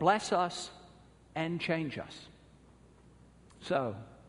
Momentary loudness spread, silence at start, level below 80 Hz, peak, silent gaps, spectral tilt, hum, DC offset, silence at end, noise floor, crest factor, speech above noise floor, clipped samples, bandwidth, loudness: 20 LU; 0 s; -66 dBFS; -12 dBFS; none; -5 dB/octave; none; under 0.1%; 0.15 s; -59 dBFS; 22 dB; 27 dB; under 0.1%; 10.5 kHz; -34 LUFS